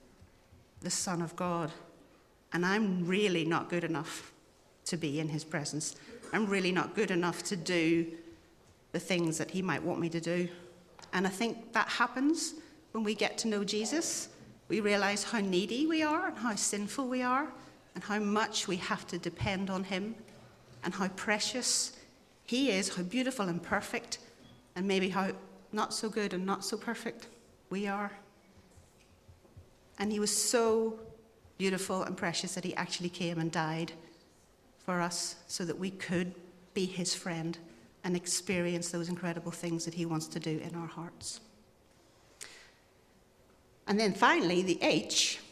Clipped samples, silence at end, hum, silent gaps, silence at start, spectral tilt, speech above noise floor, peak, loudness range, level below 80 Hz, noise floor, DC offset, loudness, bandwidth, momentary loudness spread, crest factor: under 0.1%; 0 s; none; none; 0.2 s; -3.5 dB/octave; 31 dB; -12 dBFS; 6 LU; -68 dBFS; -64 dBFS; under 0.1%; -33 LUFS; 15 kHz; 13 LU; 24 dB